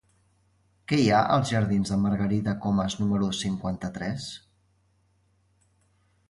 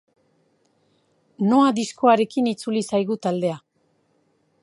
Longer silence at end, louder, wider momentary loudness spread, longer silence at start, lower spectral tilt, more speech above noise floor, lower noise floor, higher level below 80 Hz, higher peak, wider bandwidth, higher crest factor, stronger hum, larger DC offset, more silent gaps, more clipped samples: first, 1.9 s vs 1.05 s; second, -26 LUFS vs -21 LUFS; first, 12 LU vs 8 LU; second, 0.9 s vs 1.4 s; about the same, -6 dB/octave vs -6 dB/octave; second, 42 dB vs 46 dB; about the same, -67 dBFS vs -66 dBFS; first, -52 dBFS vs -70 dBFS; second, -8 dBFS vs -4 dBFS; about the same, 11.5 kHz vs 11.5 kHz; about the same, 20 dB vs 20 dB; neither; neither; neither; neither